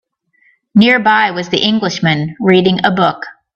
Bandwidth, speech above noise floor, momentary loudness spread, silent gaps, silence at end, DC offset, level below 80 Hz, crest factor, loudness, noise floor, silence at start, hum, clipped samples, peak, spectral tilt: 7 kHz; 43 dB; 6 LU; none; 0.25 s; under 0.1%; -54 dBFS; 14 dB; -12 LUFS; -55 dBFS; 0.75 s; none; under 0.1%; 0 dBFS; -5.5 dB/octave